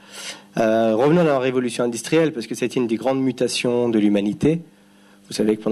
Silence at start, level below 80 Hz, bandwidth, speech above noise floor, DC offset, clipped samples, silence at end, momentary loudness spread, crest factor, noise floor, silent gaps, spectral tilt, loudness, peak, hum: 0.1 s; -56 dBFS; 13 kHz; 32 dB; under 0.1%; under 0.1%; 0 s; 9 LU; 14 dB; -51 dBFS; none; -5.5 dB/octave; -20 LUFS; -6 dBFS; none